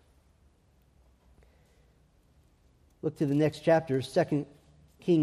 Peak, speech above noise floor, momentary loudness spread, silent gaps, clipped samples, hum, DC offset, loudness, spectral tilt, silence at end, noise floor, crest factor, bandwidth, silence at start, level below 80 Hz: -12 dBFS; 37 dB; 12 LU; none; under 0.1%; none; under 0.1%; -29 LUFS; -7.5 dB/octave; 0 s; -65 dBFS; 20 dB; 13.5 kHz; 3.05 s; -64 dBFS